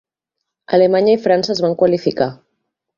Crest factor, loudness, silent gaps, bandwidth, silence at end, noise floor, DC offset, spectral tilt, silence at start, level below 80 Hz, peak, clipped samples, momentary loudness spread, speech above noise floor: 16 dB; -15 LUFS; none; 7.4 kHz; 0.65 s; -79 dBFS; under 0.1%; -6 dB/octave; 0.7 s; -58 dBFS; -2 dBFS; under 0.1%; 7 LU; 65 dB